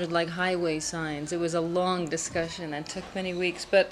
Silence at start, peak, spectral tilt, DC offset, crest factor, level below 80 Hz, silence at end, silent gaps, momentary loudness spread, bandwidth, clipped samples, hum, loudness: 0 s; -10 dBFS; -4 dB/octave; under 0.1%; 18 dB; -56 dBFS; 0 s; none; 8 LU; 13 kHz; under 0.1%; none; -29 LUFS